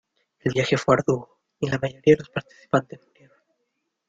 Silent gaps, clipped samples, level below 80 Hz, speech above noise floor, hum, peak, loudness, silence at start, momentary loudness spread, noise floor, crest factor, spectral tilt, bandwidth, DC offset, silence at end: none; under 0.1%; -58 dBFS; 54 dB; none; -4 dBFS; -23 LUFS; 0.45 s; 11 LU; -77 dBFS; 22 dB; -6 dB/octave; 7.8 kHz; under 0.1%; 1.15 s